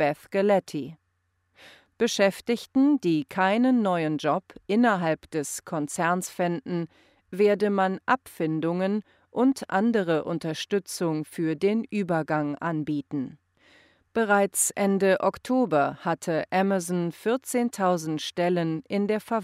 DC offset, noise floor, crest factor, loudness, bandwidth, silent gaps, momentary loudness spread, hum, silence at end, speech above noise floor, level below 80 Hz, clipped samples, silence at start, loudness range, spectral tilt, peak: under 0.1%; -74 dBFS; 18 dB; -26 LUFS; 16 kHz; none; 8 LU; none; 0 s; 48 dB; -68 dBFS; under 0.1%; 0 s; 3 LU; -5 dB/octave; -8 dBFS